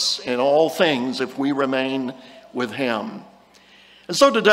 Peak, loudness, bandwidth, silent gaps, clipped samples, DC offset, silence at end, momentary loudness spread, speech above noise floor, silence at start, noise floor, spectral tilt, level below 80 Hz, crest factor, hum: 0 dBFS; -21 LUFS; 16 kHz; none; under 0.1%; under 0.1%; 0 s; 16 LU; 31 dB; 0 s; -51 dBFS; -3.5 dB/octave; -66 dBFS; 20 dB; none